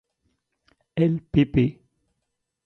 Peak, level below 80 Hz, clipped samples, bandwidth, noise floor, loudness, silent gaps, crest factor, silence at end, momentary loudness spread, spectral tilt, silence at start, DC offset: -6 dBFS; -46 dBFS; under 0.1%; 6 kHz; -79 dBFS; -23 LUFS; none; 20 dB; 0.95 s; 6 LU; -10 dB/octave; 0.95 s; under 0.1%